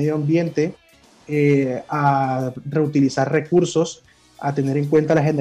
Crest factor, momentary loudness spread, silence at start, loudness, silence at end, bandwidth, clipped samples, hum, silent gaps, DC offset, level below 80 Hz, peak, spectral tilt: 12 dB; 8 LU; 0 s; -20 LUFS; 0 s; 10.5 kHz; under 0.1%; none; none; under 0.1%; -60 dBFS; -6 dBFS; -7 dB/octave